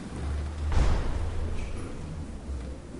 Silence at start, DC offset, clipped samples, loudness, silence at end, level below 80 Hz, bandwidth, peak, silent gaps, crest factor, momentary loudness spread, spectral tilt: 0 s; under 0.1%; under 0.1%; -33 LUFS; 0 s; -30 dBFS; 10.5 kHz; -14 dBFS; none; 16 dB; 10 LU; -6.5 dB/octave